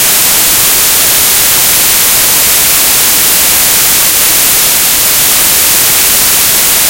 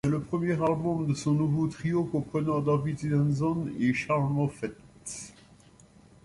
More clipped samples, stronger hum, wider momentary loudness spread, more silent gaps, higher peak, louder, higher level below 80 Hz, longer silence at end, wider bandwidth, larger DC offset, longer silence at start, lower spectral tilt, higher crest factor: first, 3% vs under 0.1%; neither; second, 0 LU vs 13 LU; neither; first, 0 dBFS vs -14 dBFS; first, -4 LUFS vs -28 LUFS; first, -34 dBFS vs -56 dBFS; second, 0 s vs 0.95 s; first, over 20 kHz vs 11.5 kHz; neither; about the same, 0 s vs 0.05 s; second, 0.5 dB/octave vs -7.5 dB/octave; second, 6 dB vs 14 dB